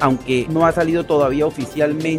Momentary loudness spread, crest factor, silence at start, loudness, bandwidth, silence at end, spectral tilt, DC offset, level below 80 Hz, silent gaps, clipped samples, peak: 4 LU; 16 dB; 0 s; -18 LUFS; 15.5 kHz; 0 s; -6.5 dB/octave; under 0.1%; -42 dBFS; none; under 0.1%; -2 dBFS